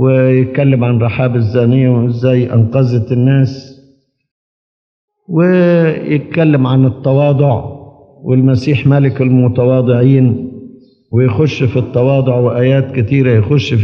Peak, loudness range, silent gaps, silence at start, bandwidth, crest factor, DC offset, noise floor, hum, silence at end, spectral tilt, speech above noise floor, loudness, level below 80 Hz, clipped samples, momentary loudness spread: 0 dBFS; 3 LU; 4.31-5.08 s; 0 s; 6.4 kHz; 10 dB; under 0.1%; -50 dBFS; none; 0 s; -9.5 dB/octave; 40 dB; -11 LUFS; -50 dBFS; under 0.1%; 5 LU